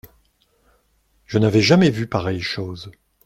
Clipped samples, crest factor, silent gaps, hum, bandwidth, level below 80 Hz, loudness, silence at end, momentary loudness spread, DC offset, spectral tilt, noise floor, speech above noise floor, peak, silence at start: under 0.1%; 20 dB; none; none; 14 kHz; -54 dBFS; -18 LUFS; 0.35 s; 18 LU; under 0.1%; -6 dB/octave; -63 dBFS; 44 dB; -2 dBFS; 1.3 s